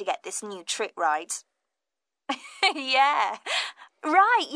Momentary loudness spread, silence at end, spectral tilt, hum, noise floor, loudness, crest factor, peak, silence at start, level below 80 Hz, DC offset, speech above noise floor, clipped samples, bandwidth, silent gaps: 14 LU; 0 s; 0 dB/octave; none; -89 dBFS; -25 LUFS; 20 dB; -8 dBFS; 0 s; -84 dBFS; under 0.1%; 63 dB; under 0.1%; 11 kHz; none